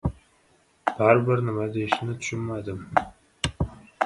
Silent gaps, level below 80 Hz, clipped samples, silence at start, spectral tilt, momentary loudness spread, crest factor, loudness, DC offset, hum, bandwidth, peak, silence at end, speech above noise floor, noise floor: none; -44 dBFS; under 0.1%; 0.05 s; -6 dB/octave; 13 LU; 24 dB; -26 LUFS; under 0.1%; none; 11.5 kHz; -2 dBFS; 0 s; 38 dB; -62 dBFS